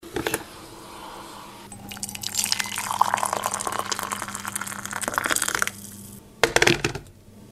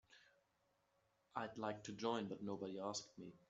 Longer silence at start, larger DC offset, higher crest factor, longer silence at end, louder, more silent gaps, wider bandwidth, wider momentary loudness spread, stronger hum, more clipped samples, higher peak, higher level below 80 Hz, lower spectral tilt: about the same, 0 s vs 0.1 s; neither; about the same, 26 dB vs 22 dB; second, 0 s vs 0.15 s; first, -25 LUFS vs -47 LUFS; neither; first, 16 kHz vs 8 kHz; first, 20 LU vs 6 LU; neither; neither; first, 0 dBFS vs -26 dBFS; first, -52 dBFS vs -86 dBFS; second, -2 dB/octave vs -4 dB/octave